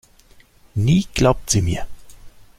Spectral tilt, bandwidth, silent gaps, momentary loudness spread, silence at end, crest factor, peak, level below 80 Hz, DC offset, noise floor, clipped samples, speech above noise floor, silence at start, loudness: -5.5 dB/octave; 16 kHz; none; 13 LU; 0.3 s; 18 dB; -2 dBFS; -36 dBFS; under 0.1%; -50 dBFS; under 0.1%; 33 dB; 0.75 s; -19 LUFS